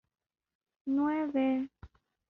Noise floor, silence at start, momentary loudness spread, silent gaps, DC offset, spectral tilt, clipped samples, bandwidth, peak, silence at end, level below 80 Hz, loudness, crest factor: -57 dBFS; 0.85 s; 12 LU; none; under 0.1%; -5 dB/octave; under 0.1%; 4.1 kHz; -20 dBFS; 0.45 s; -66 dBFS; -31 LUFS; 14 dB